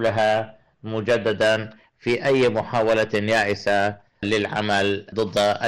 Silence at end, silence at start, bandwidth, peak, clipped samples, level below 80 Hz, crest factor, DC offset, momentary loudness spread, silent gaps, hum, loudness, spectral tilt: 0 s; 0 s; 13 kHz; -12 dBFS; under 0.1%; -56 dBFS; 10 dB; under 0.1%; 10 LU; none; none; -22 LUFS; -5 dB/octave